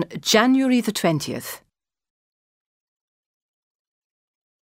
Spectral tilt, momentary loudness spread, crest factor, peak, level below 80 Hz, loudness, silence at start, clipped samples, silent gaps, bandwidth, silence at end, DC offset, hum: -4 dB/octave; 17 LU; 22 dB; -2 dBFS; -66 dBFS; -19 LUFS; 0 s; under 0.1%; none; 16 kHz; 3.05 s; under 0.1%; none